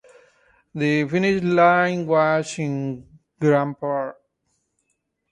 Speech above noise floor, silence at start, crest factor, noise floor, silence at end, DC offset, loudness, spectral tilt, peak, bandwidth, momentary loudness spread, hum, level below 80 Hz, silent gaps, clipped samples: 54 dB; 0.75 s; 18 dB; -74 dBFS; 1.2 s; under 0.1%; -21 LUFS; -6.5 dB/octave; -4 dBFS; 11 kHz; 13 LU; none; -62 dBFS; none; under 0.1%